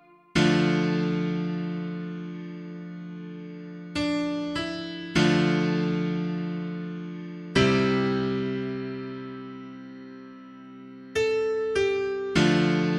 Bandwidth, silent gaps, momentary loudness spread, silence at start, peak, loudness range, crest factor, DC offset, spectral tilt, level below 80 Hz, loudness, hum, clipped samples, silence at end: 10.5 kHz; none; 19 LU; 0.35 s; -8 dBFS; 7 LU; 18 dB; under 0.1%; -6 dB/octave; -54 dBFS; -26 LUFS; none; under 0.1%; 0 s